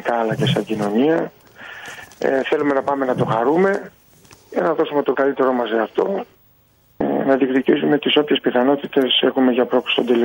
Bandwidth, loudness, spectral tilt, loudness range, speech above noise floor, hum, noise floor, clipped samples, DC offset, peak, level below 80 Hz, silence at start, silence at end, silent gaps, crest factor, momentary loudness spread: 16.5 kHz; -18 LUFS; -6 dB/octave; 4 LU; 38 dB; none; -56 dBFS; under 0.1%; under 0.1%; -4 dBFS; -60 dBFS; 0 s; 0 s; none; 16 dB; 10 LU